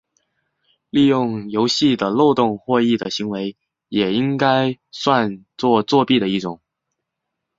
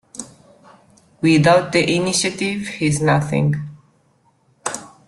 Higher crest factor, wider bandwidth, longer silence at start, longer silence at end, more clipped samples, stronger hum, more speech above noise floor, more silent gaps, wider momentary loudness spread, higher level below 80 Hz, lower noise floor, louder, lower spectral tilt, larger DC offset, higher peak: about the same, 18 dB vs 18 dB; second, 7.8 kHz vs 12.5 kHz; first, 0.95 s vs 0.15 s; first, 1.05 s vs 0.2 s; neither; neither; first, 61 dB vs 43 dB; neither; second, 9 LU vs 15 LU; second, -58 dBFS vs -52 dBFS; first, -79 dBFS vs -59 dBFS; about the same, -18 LUFS vs -18 LUFS; about the same, -5.5 dB/octave vs -5 dB/octave; neither; about the same, -2 dBFS vs -2 dBFS